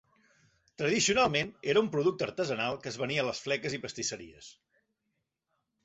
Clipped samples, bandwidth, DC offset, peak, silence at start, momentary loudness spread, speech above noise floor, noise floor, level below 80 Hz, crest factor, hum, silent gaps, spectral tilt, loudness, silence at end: under 0.1%; 8.2 kHz; under 0.1%; -12 dBFS; 0.8 s; 10 LU; 52 dB; -83 dBFS; -64 dBFS; 20 dB; none; none; -3.5 dB/octave; -30 LUFS; 1.35 s